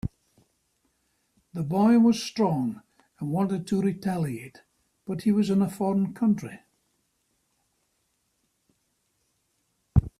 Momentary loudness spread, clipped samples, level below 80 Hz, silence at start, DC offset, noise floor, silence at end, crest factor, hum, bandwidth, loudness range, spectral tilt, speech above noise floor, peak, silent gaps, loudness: 18 LU; under 0.1%; -46 dBFS; 0.05 s; under 0.1%; -74 dBFS; 0.1 s; 22 dB; none; 14 kHz; 7 LU; -7.5 dB/octave; 49 dB; -4 dBFS; none; -25 LUFS